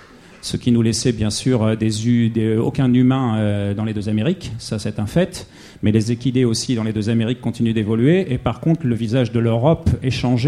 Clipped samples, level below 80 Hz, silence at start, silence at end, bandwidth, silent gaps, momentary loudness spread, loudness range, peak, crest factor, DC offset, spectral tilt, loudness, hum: under 0.1%; -40 dBFS; 0.45 s; 0 s; 13 kHz; none; 7 LU; 3 LU; -2 dBFS; 16 dB; under 0.1%; -6.5 dB/octave; -19 LUFS; none